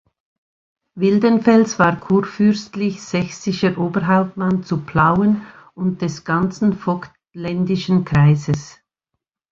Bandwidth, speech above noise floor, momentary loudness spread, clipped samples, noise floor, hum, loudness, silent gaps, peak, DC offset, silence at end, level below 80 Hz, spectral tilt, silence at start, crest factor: 7.6 kHz; 62 dB; 10 LU; under 0.1%; -79 dBFS; none; -18 LUFS; none; 0 dBFS; under 0.1%; 0.8 s; -48 dBFS; -7 dB/octave; 0.95 s; 18 dB